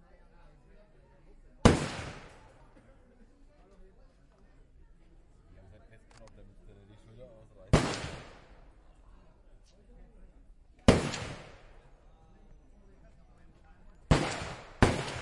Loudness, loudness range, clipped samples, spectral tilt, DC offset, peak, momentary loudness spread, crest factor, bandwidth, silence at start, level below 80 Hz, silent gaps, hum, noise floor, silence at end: -30 LUFS; 4 LU; under 0.1%; -5.5 dB/octave; under 0.1%; -4 dBFS; 28 LU; 32 dB; 11.5 kHz; 1.65 s; -44 dBFS; none; none; -60 dBFS; 0 s